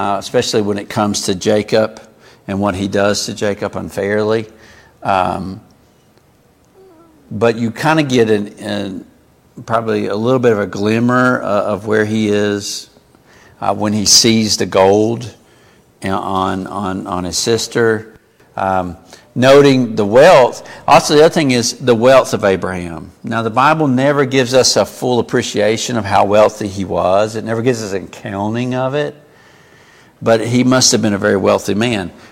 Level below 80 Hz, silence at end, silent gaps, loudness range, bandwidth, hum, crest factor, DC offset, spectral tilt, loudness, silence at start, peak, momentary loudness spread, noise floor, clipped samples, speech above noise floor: -50 dBFS; 0.2 s; none; 8 LU; 17 kHz; none; 14 dB; under 0.1%; -4 dB/octave; -14 LUFS; 0 s; 0 dBFS; 13 LU; -51 dBFS; under 0.1%; 37 dB